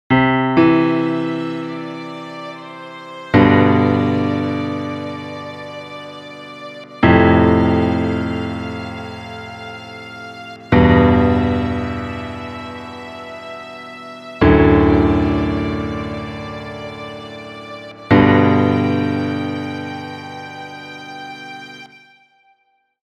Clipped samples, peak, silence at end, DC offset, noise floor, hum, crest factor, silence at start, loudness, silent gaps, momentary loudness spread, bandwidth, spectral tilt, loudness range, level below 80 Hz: under 0.1%; 0 dBFS; 1.15 s; under 0.1%; -63 dBFS; none; 16 dB; 0.1 s; -16 LUFS; none; 20 LU; 8.4 kHz; -8 dB/octave; 6 LU; -34 dBFS